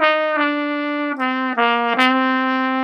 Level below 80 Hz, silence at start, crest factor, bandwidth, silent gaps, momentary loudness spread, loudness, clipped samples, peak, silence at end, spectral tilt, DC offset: -78 dBFS; 0 s; 18 dB; 11 kHz; none; 6 LU; -18 LUFS; under 0.1%; 0 dBFS; 0 s; -4 dB/octave; under 0.1%